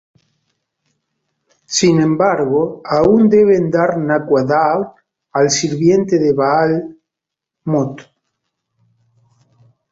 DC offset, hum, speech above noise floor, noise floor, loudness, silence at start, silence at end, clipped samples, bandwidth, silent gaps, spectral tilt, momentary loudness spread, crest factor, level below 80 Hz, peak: under 0.1%; none; 69 dB; -83 dBFS; -14 LUFS; 1.7 s; 1.9 s; under 0.1%; 7.8 kHz; none; -5.5 dB/octave; 11 LU; 14 dB; -52 dBFS; -2 dBFS